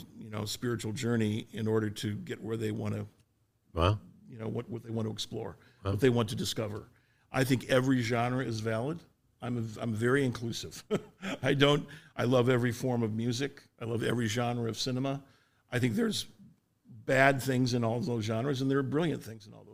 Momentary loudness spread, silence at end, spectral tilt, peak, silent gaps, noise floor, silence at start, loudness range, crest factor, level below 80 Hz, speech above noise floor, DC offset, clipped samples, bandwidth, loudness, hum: 13 LU; 0 s; -5.5 dB/octave; -8 dBFS; none; -71 dBFS; 0 s; 4 LU; 24 dB; -58 dBFS; 40 dB; under 0.1%; under 0.1%; 16 kHz; -31 LUFS; none